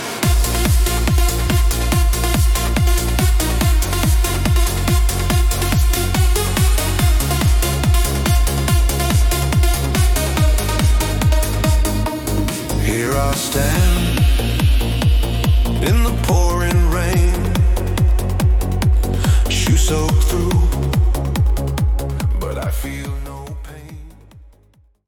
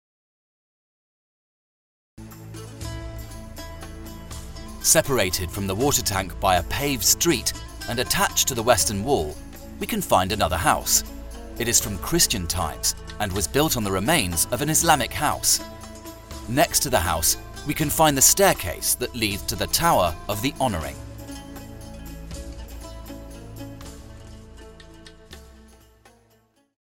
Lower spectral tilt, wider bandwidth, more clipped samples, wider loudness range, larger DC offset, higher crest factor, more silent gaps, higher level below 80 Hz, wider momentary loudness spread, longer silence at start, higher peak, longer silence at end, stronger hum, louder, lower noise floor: first, -5 dB/octave vs -2.5 dB/octave; about the same, 18 kHz vs 17 kHz; neither; second, 2 LU vs 20 LU; neither; second, 12 dB vs 24 dB; neither; first, -18 dBFS vs -40 dBFS; second, 4 LU vs 21 LU; second, 0 s vs 2.2 s; about the same, -2 dBFS vs 0 dBFS; second, 0.7 s vs 1.35 s; neither; first, -17 LUFS vs -21 LUFS; second, -53 dBFS vs -62 dBFS